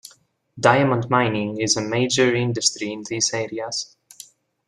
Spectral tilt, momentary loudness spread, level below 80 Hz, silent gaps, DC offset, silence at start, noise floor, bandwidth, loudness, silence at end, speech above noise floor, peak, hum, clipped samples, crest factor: -3.5 dB/octave; 10 LU; -60 dBFS; none; under 0.1%; 0.55 s; -56 dBFS; 12.5 kHz; -21 LUFS; 0.8 s; 35 dB; 0 dBFS; none; under 0.1%; 22 dB